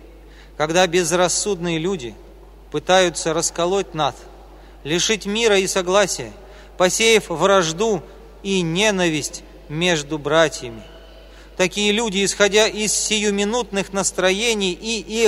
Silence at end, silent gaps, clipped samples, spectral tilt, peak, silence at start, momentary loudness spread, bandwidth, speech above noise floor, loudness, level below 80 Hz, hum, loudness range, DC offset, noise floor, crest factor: 0 s; none; under 0.1%; -3 dB/octave; 0 dBFS; 0 s; 12 LU; 15.5 kHz; 23 dB; -19 LUFS; -44 dBFS; none; 3 LU; under 0.1%; -42 dBFS; 20 dB